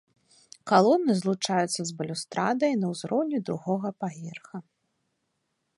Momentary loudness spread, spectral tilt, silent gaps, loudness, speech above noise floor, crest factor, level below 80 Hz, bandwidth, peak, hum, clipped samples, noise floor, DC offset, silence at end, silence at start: 18 LU; -5 dB/octave; none; -26 LUFS; 51 dB; 22 dB; -76 dBFS; 11.5 kHz; -6 dBFS; none; under 0.1%; -78 dBFS; under 0.1%; 1.15 s; 0.65 s